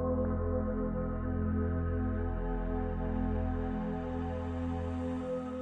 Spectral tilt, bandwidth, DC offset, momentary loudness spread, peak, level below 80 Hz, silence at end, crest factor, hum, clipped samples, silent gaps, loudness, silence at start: -10 dB/octave; 4 kHz; under 0.1%; 4 LU; -20 dBFS; -40 dBFS; 0 s; 14 dB; none; under 0.1%; none; -35 LUFS; 0 s